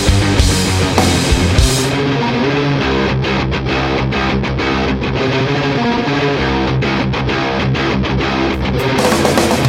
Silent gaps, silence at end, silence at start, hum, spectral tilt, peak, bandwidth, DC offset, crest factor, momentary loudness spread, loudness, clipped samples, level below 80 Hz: none; 0 s; 0 s; none; -5 dB/octave; 0 dBFS; 16.5 kHz; under 0.1%; 14 dB; 4 LU; -14 LUFS; under 0.1%; -24 dBFS